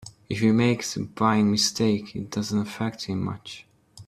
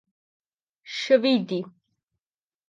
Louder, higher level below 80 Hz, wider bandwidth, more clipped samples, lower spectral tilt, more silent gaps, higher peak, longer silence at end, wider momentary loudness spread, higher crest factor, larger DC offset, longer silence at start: about the same, -25 LUFS vs -23 LUFS; first, -60 dBFS vs -82 dBFS; first, 14 kHz vs 7.6 kHz; neither; about the same, -5 dB/octave vs -5 dB/octave; neither; about the same, -6 dBFS vs -6 dBFS; second, 0.05 s vs 1 s; second, 12 LU vs 15 LU; about the same, 18 dB vs 22 dB; neither; second, 0 s vs 0.85 s